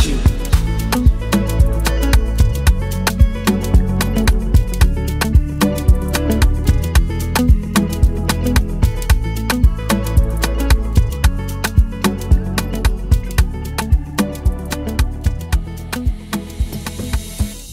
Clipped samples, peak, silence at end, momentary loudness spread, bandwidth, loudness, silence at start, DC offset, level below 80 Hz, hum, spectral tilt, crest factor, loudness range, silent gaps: under 0.1%; 0 dBFS; 0 s; 7 LU; 16 kHz; -17 LUFS; 0 s; under 0.1%; -16 dBFS; none; -5.5 dB/octave; 14 dB; 4 LU; none